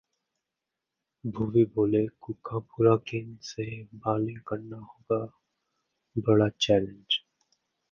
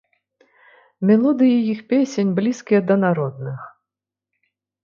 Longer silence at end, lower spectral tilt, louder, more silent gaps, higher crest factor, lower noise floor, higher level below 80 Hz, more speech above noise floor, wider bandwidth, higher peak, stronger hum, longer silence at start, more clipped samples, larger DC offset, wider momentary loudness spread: second, 0.75 s vs 1.15 s; about the same, -6.5 dB/octave vs -7.5 dB/octave; second, -28 LUFS vs -18 LUFS; neither; first, 22 dB vs 16 dB; about the same, -87 dBFS vs -87 dBFS; first, -60 dBFS vs -68 dBFS; second, 60 dB vs 69 dB; about the same, 7.2 kHz vs 7.4 kHz; second, -8 dBFS vs -4 dBFS; second, none vs 50 Hz at -35 dBFS; first, 1.25 s vs 1 s; neither; neither; first, 15 LU vs 12 LU